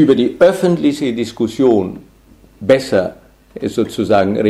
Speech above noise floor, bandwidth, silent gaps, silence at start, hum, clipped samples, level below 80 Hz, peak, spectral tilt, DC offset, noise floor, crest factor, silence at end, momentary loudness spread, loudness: 32 dB; 13.5 kHz; none; 0 s; none; under 0.1%; -48 dBFS; 0 dBFS; -6.5 dB/octave; under 0.1%; -46 dBFS; 14 dB; 0 s; 12 LU; -15 LUFS